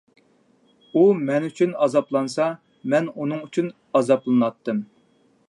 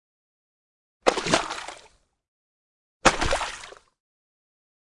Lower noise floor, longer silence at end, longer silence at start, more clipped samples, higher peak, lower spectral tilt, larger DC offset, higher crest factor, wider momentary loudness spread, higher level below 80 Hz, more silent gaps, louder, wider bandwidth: first, -61 dBFS vs -57 dBFS; second, 0.65 s vs 1.3 s; about the same, 0.95 s vs 1.05 s; neither; about the same, -4 dBFS vs -4 dBFS; first, -7 dB/octave vs -2.5 dB/octave; neither; second, 18 dB vs 26 dB; second, 10 LU vs 18 LU; second, -76 dBFS vs -44 dBFS; second, none vs 2.28-3.00 s; first, -22 LUFS vs -25 LUFS; about the same, 11 kHz vs 11.5 kHz